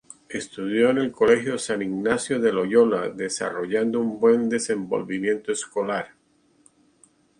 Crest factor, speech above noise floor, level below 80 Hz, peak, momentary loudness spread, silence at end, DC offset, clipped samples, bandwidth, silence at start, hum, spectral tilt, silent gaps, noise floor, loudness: 18 dB; 40 dB; -64 dBFS; -4 dBFS; 8 LU; 1.35 s; under 0.1%; under 0.1%; 11 kHz; 0.3 s; none; -4.5 dB/octave; none; -62 dBFS; -23 LUFS